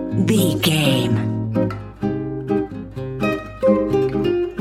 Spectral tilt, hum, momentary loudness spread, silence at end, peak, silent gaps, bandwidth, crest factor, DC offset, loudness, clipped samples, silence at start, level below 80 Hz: -6 dB/octave; none; 9 LU; 0 s; -2 dBFS; none; 16.5 kHz; 16 dB; under 0.1%; -20 LUFS; under 0.1%; 0 s; -42 dBFS